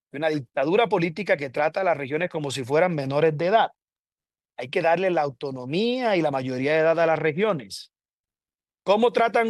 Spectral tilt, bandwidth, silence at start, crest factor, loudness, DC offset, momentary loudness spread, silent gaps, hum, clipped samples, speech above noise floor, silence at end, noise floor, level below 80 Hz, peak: -6 dB/octave; 12.5 kHz; 0.15 s; 16 dB; -23 LUFS; under 0.1%; 9 LU; 3.99-4.04 s, 8.19-8.24 s; none; under 0.1%; over 67 dB; 0 s; under -90 dBFS; -72 dBFS; -8 dBFS